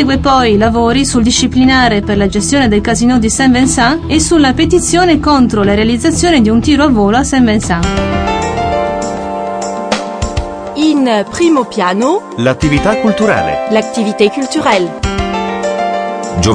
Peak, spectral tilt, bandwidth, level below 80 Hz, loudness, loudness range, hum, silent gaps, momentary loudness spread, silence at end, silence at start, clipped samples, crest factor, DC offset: 0 dBFS; -4.5 dB/octave; 10.5 kHz; -26 dBFS; -11 LUFS; 5 LU; none; none; 8 LU; 0 s; 0 s; under 0.1%; 10 dB; under 0.1%